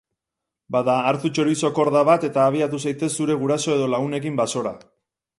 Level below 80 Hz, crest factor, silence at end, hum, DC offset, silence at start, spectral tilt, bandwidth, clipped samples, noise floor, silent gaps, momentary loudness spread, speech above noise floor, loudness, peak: -66 dBFS; 18 dB; 0.6 s; none; under 0.1%; 0.7 s; -5.5 dB/octave; 11.5 kHz; under 0.1%; -85 dBFS; none; 7 LU; 64 dB; -21 LUFS; -2 dBFS